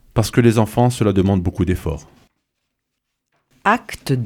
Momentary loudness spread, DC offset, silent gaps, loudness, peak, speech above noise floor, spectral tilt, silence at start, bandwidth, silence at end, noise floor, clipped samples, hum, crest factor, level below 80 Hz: 8 LU; under 0.1%; none; -18 LUFS; -2 dBFS; 60 dB; -6.5 dB/octave; 0.15 s; 17 kHz; 0 s; -76 dBFS; under 0.1%; none; 18 dB; -38 dBFS